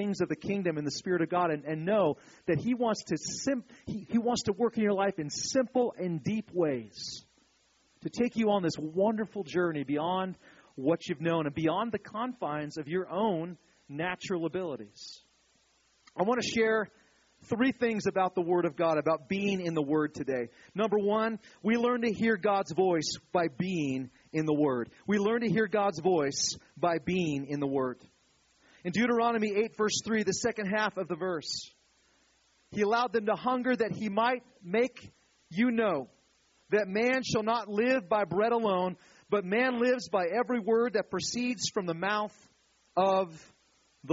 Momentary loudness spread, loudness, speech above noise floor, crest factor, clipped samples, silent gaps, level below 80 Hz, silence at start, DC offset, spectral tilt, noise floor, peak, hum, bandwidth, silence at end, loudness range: 9 LU; -30 LUFS; 39 dB; 16 dB; under 0.1%; none; -68 dBFS; 0 s; under 0.1%; -4.5 dB/octave; -69 dBFS; -14 dBFS; none; 7.6 kHz; 0 s; 4 LU